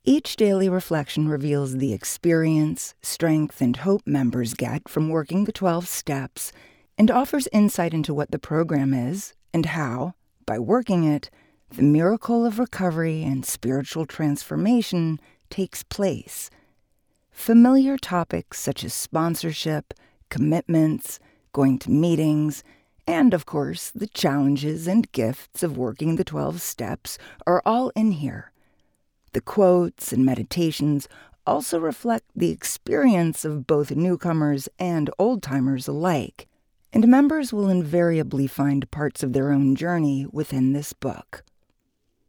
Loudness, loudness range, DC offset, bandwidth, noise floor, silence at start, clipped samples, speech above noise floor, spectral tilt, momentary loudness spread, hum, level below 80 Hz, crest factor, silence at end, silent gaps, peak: -23 LUFS; 4 LU; under 0.1%; over 20 kHz; -71 dBFS; 0.05 s; under 0.1%; 49 dB; -6 dB/octave; 11 LU; none; -54 dBFS; 18 dB; 0.9 s; none; -6 dBFS